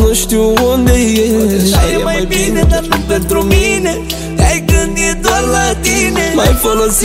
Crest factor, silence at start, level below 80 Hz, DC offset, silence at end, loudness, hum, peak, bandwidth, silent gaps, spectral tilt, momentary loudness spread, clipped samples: 10 dB; 0 s; -18 dBFS; under 0.1%; 0 s; -11 LUFS; none; 0 dBFS; 16.5 kHz; none; -4.5 dB/octave; 3 LU; under 0.1%